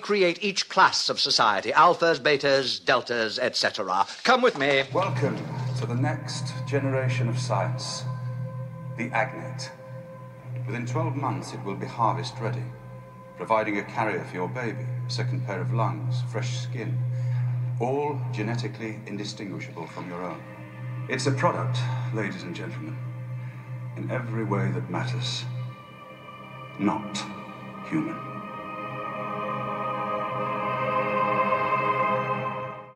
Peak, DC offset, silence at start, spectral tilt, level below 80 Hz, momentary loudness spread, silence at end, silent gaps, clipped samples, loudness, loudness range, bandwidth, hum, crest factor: -6 dBFS; under 0.1%; 0 s; -5 dB/octave; -66 dBFS; 15 LU; 0.05 s; none; under 0.1%; -27 LUFS; 10 LU; 11 kHz; none; 22 dB